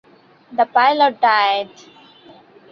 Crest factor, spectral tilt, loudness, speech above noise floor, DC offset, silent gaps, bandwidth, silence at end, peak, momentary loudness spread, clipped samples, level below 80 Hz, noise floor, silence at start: 18 dB; -3.5 dB/octave; -16 LUFS; 30 dB; under 0.1%; none; 6.8 kHz; 1.05 s; -2 dBFS; 12 LU; under 0.1%; -74 dBFS; -46 dBFS; 0.5 s